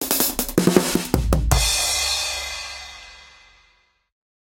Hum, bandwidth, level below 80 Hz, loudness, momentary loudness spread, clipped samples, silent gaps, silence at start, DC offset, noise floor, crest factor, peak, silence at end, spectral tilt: none; 17 kHz; -30 dBFS; -20 LUFS; 15 LU; under 0.1%; none; 0 s; under 0.1%; -61 dBFS; 22 dB; 0 dBFS; 1.25 s; -3.5 dB/octave